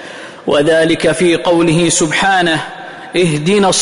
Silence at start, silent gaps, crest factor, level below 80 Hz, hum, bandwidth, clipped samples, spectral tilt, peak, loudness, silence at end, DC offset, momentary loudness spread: 0 s; none; 10 dB; -46 dBFS; none; 11 kHz; under 0.1%; -4 dB/octave; -2 dBFS; -12 LUFS; 0 s; under 0.1%; 11 LU